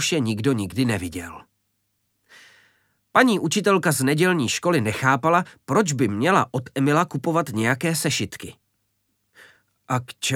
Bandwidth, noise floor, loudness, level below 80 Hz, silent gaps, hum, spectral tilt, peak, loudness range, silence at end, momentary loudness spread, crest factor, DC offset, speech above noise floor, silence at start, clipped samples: 17.5 kHz; -72 dBFS; -21 LUFS; -58 dBFS; none; none; -4.5 dB/octave; -2 dBFS; 5 LU; 0 s; 9 LU; 22 dB; under 0.1%; 51 dB; 0 s; under 0.1%